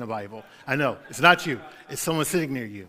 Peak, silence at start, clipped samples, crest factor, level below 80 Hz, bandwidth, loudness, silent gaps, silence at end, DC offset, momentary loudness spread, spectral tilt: 0 dBFS; 0 s; under 0.1%; 26 dB; -60 dBFS; 16 kHz; -24 LUFS; none; 0 s; under 0.1%; 17 LU; -4 dB/octave